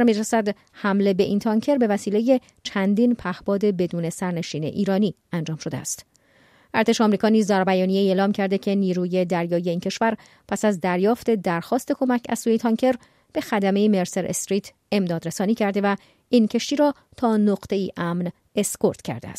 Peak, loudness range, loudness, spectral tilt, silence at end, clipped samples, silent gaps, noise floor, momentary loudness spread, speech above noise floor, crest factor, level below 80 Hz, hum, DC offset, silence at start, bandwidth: -6 dBFS; 3 LU; -22 LUFS; -5.5 dB/octave; 0 s; under 0.1%; none; -57 dBFS; 8 LU; 35 dB; 16 dB; -60 dBFS; none; under 0.1%; 0 s; 15 kHz